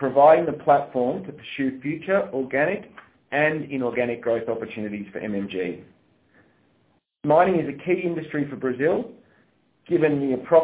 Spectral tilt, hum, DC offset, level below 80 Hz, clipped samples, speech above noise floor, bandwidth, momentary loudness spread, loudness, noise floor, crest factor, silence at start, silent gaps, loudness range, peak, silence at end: -10.5 dB/octave; none; under 0.1%; -62 dBFS; under 0.1%; 43 dB; 4 kHz; 13 LU; -23 LUFS; -65 dBFS; 18 dB; 0 s; none; 5 LU; -4 dBFS; 0 s